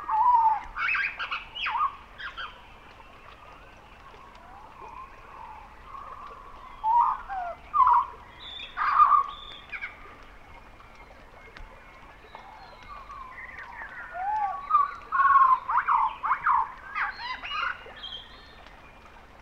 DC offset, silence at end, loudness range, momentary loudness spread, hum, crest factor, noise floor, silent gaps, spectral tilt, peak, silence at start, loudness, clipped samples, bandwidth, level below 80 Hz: under 0.1%; 0.25 s; 21 LU; 27 LU; none; 20 dB; -50 dBFS; none; -3 dB/octave; -8 dBFS; 0 s; -25 LUFS; under 0.1%; 7.6 kHz; -54 dBFS